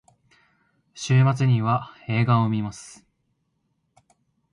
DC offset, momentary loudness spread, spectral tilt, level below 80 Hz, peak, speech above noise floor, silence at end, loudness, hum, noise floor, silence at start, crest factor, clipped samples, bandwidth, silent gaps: under 0.1%; 16 LU; -7 dB/octave; -60 dBFS; -8 dBFS; 51 dB; 1.6 s; -22 LUFS; none; -73 dBFS; 0.95 s; 18 dB; under 0.1%; 10.5 kHz; none